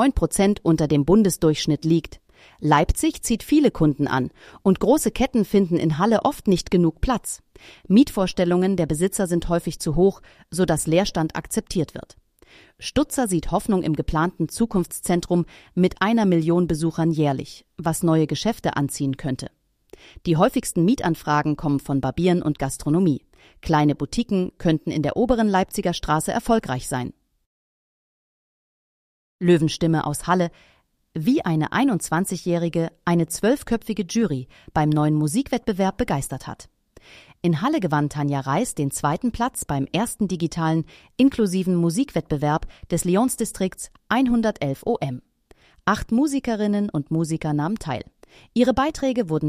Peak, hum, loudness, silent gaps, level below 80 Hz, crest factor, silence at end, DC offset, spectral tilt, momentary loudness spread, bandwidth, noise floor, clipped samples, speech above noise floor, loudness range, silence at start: -4 dBFS; none; -22 LUFS; 27.46-29.39 s; -40 dBFS; 16 dB; 0 s; under 0.1%; -6 dB/octave; 8 LU; 15.5 kHz; -56 dBFS; under 0.1%; 34 dB; 4 LU; 0 s